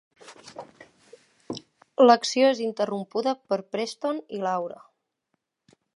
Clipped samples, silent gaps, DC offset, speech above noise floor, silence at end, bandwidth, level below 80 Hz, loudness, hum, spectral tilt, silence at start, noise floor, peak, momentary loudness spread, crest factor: under 0.1%; none; under 0.1%; 54 dB; 1.2 s; 11.5 kHz; -78 dBFS; -24 LUFS; none; -4 dB/octave; 0.25 s; -78 dBFS; -4 dBFS; 22 LU; 24 dB